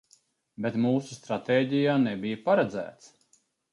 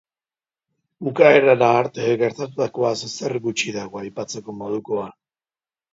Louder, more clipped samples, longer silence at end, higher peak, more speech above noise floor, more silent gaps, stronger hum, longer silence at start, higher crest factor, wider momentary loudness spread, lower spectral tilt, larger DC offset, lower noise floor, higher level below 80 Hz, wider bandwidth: second, -27 LUFS vs -20 LUFS; neither; about the same, 0.8 s vs 0.8 s; second, -10 dBFS vs 0 dBFS; second, 41 dB vs over 70 dB; neither; neither; second, 0.6 s vs 1 s; about the same, 18 dB vs 20 dB; second, 10 LU vs 17 LU; first, -6.5 dB/octave vs -5 dB/octave; neither; second, -68 dBFS vs under -90 dBFS; about the same, -70 dBFS vs -66 dBFS; first, 11.5 kHz vs 7.8 kHz